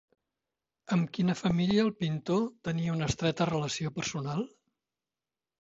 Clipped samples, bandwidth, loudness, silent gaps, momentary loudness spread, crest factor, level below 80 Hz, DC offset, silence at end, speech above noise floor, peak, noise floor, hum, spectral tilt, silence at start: under 0.1%; 8 kHz; -31 LUFS; none; 7 LU; 18 dB; -58 dBFS; under 0.1%; 1.1 s; over 60 dB; -14 dBFS; under -90 dBFS; none; -6 dB/octave; 0.9 s